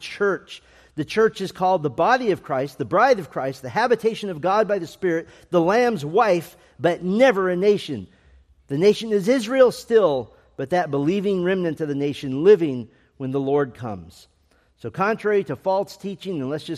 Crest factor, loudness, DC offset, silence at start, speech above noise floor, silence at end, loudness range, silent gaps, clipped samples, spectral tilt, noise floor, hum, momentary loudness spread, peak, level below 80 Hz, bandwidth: 18 dB; -21 LUFS; under 0.1%; 0 s; 40 dB; 0 s; 3 LU; none; under 0.1%; -6 dB/octave; -61 dBFS; none; 14 LU; -2 dBFS; -60 dBFS; 14 kHz